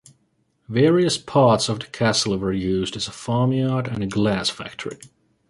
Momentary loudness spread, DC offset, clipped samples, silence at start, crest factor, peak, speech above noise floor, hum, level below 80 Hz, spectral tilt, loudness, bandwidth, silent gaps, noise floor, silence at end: 13 LU; under 0.1%; under 0.1%; 0.7 s; 18 dB; -4 dBFS; 46 dB; none; -50 dBFS; -5 dB/octave; -21 LUFS; 11.5 kHz; none; -67 dBFS; 0.45 s